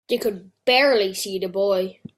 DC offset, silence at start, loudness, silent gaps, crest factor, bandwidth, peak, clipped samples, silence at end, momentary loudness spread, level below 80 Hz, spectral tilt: under 0.1%; 0.1 s; -21 LUFS; none; 16 dB; 16 kHz; -6 dBFS; under 0.1%; 0.25 s; 10 LU; -66 dBFS; -3 dB/octave